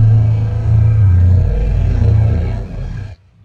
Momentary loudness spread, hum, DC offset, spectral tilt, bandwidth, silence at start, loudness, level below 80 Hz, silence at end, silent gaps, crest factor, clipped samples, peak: 15 LU; none; under 0.1%; -10 dB/octave; 4.4 kHz; 0 s; -13 LUFS; -20 dBFS; 0.3 s; none; 10 dB; under 0.1%; -2 dBFS